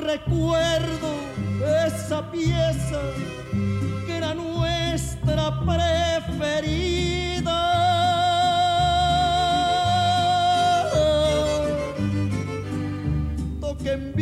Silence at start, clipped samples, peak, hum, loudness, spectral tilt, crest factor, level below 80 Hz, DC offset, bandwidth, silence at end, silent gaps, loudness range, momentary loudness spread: 0 s; under 0.1%; -10 dBFS; none; -23 LUFS; -5.5 dB/octave; 12 dB; -36 dBFS; under 0.1%; 14 kHz; 0 s; none; 5 LU; 8 LU